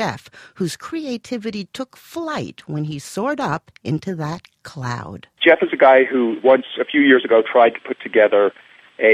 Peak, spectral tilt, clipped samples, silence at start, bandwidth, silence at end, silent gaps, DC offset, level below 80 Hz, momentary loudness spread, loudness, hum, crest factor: -2 dBFS; -5.5 dB/octave; under 0.1%; 0 s; 14.5 kHz; 0 s; none; under 0.1%; -60 dBFS; 16 LU; -18 LUFS; none; 18 dB